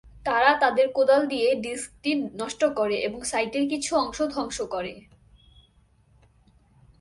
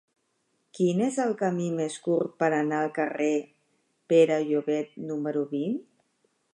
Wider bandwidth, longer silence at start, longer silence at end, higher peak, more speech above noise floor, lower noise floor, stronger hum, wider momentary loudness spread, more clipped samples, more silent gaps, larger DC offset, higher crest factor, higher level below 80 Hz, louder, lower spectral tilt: about the same, 11.5 kHz vs 11 kHz; second, 0.05 s vs 0.75 s; first, 2 s vs 0.7 s; first, -4 dBFS vs -8 dBFS; second, 36 dB vs 48 dB; second, -61 dBFS vs -74 dBFS; neither; about the same, 10 LU vs 9 LU; neither; neither; neither; about the same, 22 dB vs 18 dB; first, -56 dBFS vs -80 dBFS; first, -24 LUFS vs -27 LUFS; second, -3 dB/octave vs -6 dB/octave